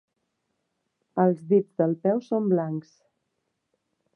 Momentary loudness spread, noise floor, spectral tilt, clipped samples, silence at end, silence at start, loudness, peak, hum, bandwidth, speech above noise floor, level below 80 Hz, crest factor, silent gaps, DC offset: 11 LU; -78 dBFS; -10.5 dB/octave; under 0.1%; 1.35 s; 1.15 s; -25 LUFS; -8 dBFS; none; 6.4 kHz; 55 dB; -78 dBFS; 20 dB; none; under 0.1%